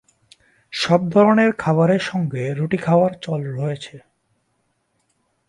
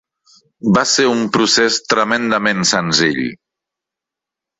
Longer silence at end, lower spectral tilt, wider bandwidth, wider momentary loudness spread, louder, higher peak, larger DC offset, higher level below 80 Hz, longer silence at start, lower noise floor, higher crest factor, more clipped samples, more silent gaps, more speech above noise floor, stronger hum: first, 1.5 s vs 1.25 s; first, -7 dB/octave vs -3 dB/octave; first, 11.5 kHz vs 8.4 kHz; first, 12 LU vs 5 LU; second, -19 LUFS vs -14 LUFS; about the same, -2 dBFS vs -2 dBFS; neither; second, -60 dBFS vs -54 dBFS; about the same, 0.7 s vs 0.65 s; second, -69 dBFS vs -85 dBFS; about the same, 18 dB vs 16 dB; neither; neither; second, 51 dB vs 70 dB; neither